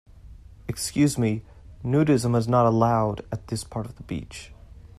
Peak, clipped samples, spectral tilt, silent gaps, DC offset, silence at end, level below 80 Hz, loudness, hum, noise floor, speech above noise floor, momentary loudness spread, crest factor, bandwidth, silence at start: -8 dBFS; under 0.1%; -6.5 dB/octave; none; under 0.1%; 0.1 s; -48 dBFS; -24 LUFS; none; -46 dBFS; 22 dB; 15 LU; 16 dB; 15 kHz; 0.15 s